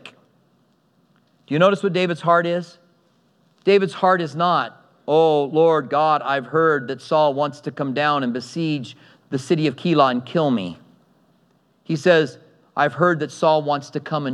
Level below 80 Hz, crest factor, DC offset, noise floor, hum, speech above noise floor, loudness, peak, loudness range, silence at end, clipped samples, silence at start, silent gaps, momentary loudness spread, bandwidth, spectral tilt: -78 dBFS; 20 dB; under 0.1%; -61 dBFS; none; 42 dB; -20 LUFS; -2 dBFS; 4 LU; 0 s; under 0.1%; 0.05 s; none; 11 LU; 11 kHz; -6.5 dB/octave